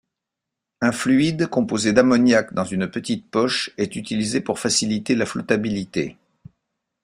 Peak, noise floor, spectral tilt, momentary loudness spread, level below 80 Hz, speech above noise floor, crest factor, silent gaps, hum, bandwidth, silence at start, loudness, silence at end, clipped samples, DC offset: -2 dBFS; -84 dBFS; -4.5 dB/octave; 9 LU; -56 dBFS; 63 dB; 20 dB; none; none; 14.5 kHz; 0.8 s; -21 LUFS; 0.9 s; under 0.1%; under 0.1%